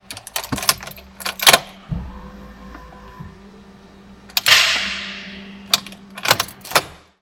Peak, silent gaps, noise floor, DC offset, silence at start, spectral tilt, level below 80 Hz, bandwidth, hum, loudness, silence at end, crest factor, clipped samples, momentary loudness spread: 0 dBFS; none; -44 dBFS; under 0.1%; 0.1 s; -1 dB/octave; -44 dBFS; 17.5 kHz; none; -17 LUFS; 0.25 s; 22 dB; under 0.1%; 27 LU